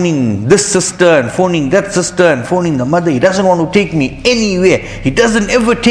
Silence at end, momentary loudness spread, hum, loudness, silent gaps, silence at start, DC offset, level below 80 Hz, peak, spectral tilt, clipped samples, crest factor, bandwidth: 0 s; 4 LU; none; -11 LUFS; none; 0 s; under 0.1%; -36 dBFS; 0 dBFS; -4.5 dB/octave; 0.5%; 10 dB; 11 kHz